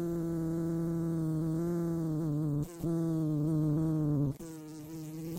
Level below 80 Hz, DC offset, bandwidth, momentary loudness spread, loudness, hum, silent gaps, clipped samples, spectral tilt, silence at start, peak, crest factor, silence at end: -56 dBFS; under 0.1%; 16 kHz; 12 LU; -33 LUFS; none; none; under 0.1%; -9 dB/octave; 0 s; -22 dBFS; 12 dB; 0 s